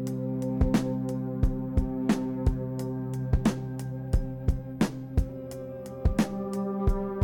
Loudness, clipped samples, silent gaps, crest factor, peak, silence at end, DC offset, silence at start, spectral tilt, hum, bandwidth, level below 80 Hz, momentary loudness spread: -30 LUFS; under 0.1%; none; 16 dB; -12 dBFS; 0 s; under 0.1%; 0 s; -7.5 dB/octave; none; 17.5 kHz; -34 dBFS; 7 LU